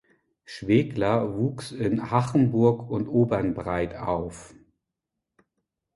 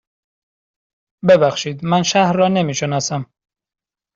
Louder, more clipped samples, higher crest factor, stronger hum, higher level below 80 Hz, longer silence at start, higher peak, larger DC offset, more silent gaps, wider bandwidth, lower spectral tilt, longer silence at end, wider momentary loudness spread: second, -25 LUFS vs -16 LUFS; neither; about the same, 20 dB vs 18 dB; neither; first, -52 dBFS vs -58 dBFS; second, 0.5 s vs 1.25 s; second, -6 dBFS vs 0 dBFS; neither; neither; first, 11.5 kHz vs 7.8 kHz; first, -8 dB/octave vs -5 dB/octave; first, 1.5 s vs 0.9 s; about the same, 9 LU vs 10 LU